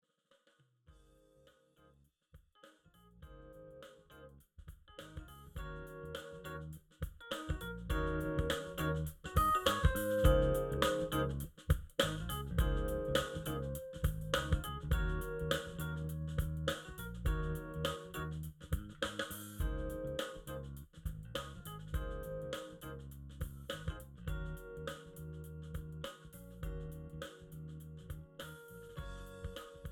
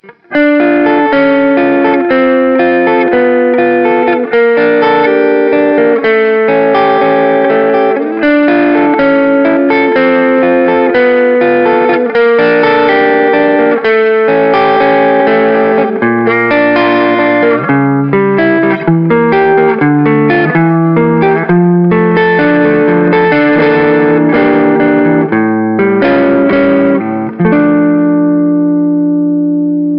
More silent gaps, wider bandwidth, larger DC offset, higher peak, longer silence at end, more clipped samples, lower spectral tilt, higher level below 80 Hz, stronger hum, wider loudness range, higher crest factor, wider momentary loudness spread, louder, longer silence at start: neither; first, over 20 kHz vs 5.6 kHz; neither; second, -16 dBFS vs 0 dBFS; about the same, 0 s vs 0 s; neither; second, -5.5 dB/octave vs -10 dB/octave; about the same, -44 dBFS vs -48 dBFS; neither; first, 16 LU vs 1 LU; first, 24 dB vs 8 dB; first, 17 LU vs 2 LU; second, -40 LUFS vs -8 LUFS; first, 0.9 s vs 0.1 s